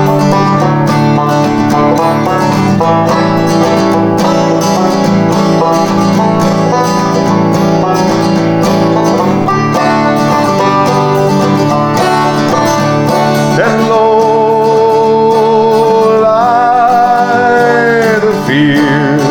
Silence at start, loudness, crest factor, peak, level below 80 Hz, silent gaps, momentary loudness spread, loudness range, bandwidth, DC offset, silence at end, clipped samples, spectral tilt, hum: 0 s; -9 LUFS; 8 dB; 0 dBFS; -42 dBFS; none; 2 LU; 2 LU; over 20 kHz; under 0.1%; 0 s; under 0.1%; -6 dB/octave; none